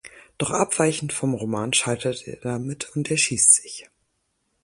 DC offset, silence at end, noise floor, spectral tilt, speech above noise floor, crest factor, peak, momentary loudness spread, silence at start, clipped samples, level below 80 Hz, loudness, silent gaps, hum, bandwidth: under 0.1%; 0.8 s; -73 dBFS; -3 dB/octave; 50 dB; 22 dB; -2 dBFS; 15 LU; 0.05 s; under 0.1%; -58 dBFS; -21 LUFS; none; none; 11.5 kHz